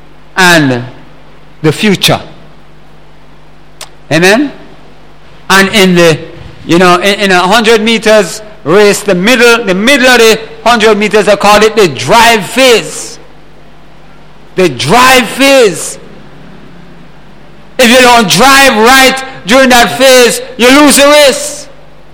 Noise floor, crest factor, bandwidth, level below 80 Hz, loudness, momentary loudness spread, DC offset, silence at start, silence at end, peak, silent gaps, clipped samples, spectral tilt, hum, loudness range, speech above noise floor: -37 dBFS; 8 dB; over 20 kHz; -36 dBFS; -5 LUFS; 14 LU; 4%; 0.35 s; 0.5 s; 0 dBFS; none; 4%; -3.5 dB/octave; none; 8 LU; 32 dB